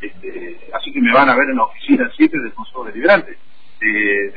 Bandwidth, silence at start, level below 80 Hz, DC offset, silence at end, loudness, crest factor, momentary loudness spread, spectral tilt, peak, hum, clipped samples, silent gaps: 5 kHz; 0 s; -54 dBFS; 4%; 0.05 s; -15 LUFS; 16 dB; 18 LU; -7.5 dB/octave; 0 dBFS; none; under 0.1%; none